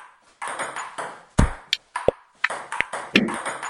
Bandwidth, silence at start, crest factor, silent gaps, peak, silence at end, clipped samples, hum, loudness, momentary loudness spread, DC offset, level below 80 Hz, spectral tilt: 14 kHz; 0 s; 26 dB; none; 0 dBFS; 0 s; under 0.1%; none; -25 LUFS; 12 LU; under 0.1%; -34 dBFS; -4.5 dB/octave